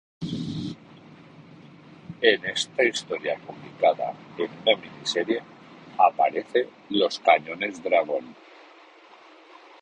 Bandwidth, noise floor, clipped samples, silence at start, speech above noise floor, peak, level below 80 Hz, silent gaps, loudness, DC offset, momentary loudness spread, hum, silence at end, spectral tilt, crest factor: 10.5 kHz; -51 dBFS; under 0.1%; 0.2 s; 27 dB; -2 dBFS; -68 dBFS; none; -25 LUFS; under 0.1%; 13 LU; none; 1.5 s; -4 dB/octave; 24 dB